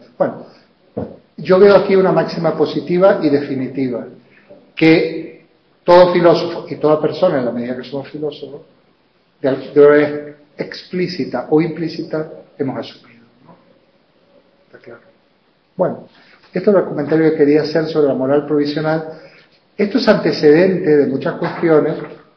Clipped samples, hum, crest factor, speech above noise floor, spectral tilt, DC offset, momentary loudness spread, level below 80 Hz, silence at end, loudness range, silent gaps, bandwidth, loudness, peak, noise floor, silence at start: under 0.1%; none; 16 dB; 43 dB; -8 dB/octave; under 0.1%; 18 LU; -58 dBFS; 0.2 s; 12 LU; none; 6.2 kHz; -15 LUFS; 0 dBFS; -57 dBFS; 0.2 s